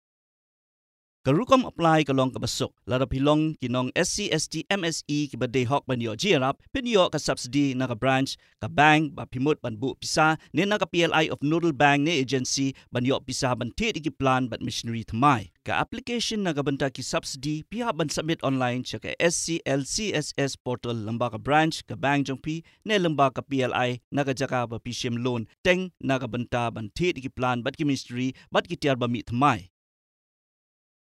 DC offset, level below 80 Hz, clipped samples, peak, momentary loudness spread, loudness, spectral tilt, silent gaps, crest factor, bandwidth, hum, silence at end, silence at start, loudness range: under 0.1%; -52 dBFS; under 0.1%; -4 dBFS; 8 LU; -26 LUFS; -4.5 dB/octave; 20.60-20.65 s, 24.04-24.11 s, 25.58-25.64 s; 22 dB; 14 kHz; none; 1.35 s; 1.25 s; 4 LU